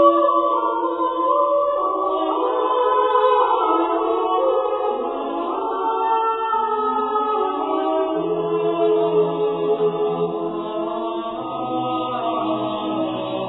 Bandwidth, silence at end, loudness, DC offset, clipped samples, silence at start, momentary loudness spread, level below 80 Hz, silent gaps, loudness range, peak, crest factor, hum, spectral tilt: 4.1 kHz; 0 s; -20 LUFS; under 0.1%; under 0.1%; 0 s; 7 LU; -60 dBFS; none; 4 LU; -2 dBFS; 18 dB; none; -9.5 dB/octave